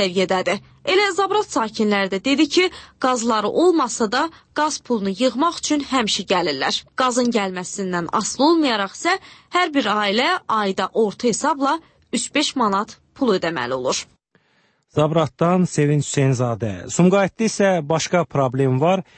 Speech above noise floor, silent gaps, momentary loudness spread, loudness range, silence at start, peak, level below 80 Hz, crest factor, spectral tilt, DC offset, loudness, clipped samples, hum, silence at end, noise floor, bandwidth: 43 dB; none; 7 LU; 3 LU; 0 s; -4 dBFS; -58 dBFS; 16 dB; -4.5 dB/octave; under 0.1%; -20 LUFS; under 0.1%; none; 0.15 s; -62 dBFS; 8.8 kHz